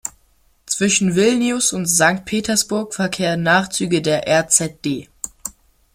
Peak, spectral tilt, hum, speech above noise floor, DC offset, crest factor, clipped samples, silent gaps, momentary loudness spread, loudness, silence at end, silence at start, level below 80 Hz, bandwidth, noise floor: 0 dBFS; -3 dB/octave; none; 40 dB; under 0.1%; 18 dB; under 0.1%; none; 14 LU; -17 LUFS; 0.45 s; 0.05 s; -52 dBFS; 16.5 kHz; -57 dBFS